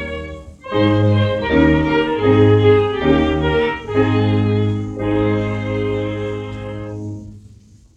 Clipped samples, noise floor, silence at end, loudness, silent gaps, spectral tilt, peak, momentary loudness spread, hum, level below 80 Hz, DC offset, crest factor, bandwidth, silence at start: under 0.1%; -45 dBFS; 0.55 s; -16 LUFS; none; -8.5 dB/octave; -2 dBFS; 15 LU; none; -36 dBFS; under 0.1%; 16 dB; 7.4 kHz; 0 s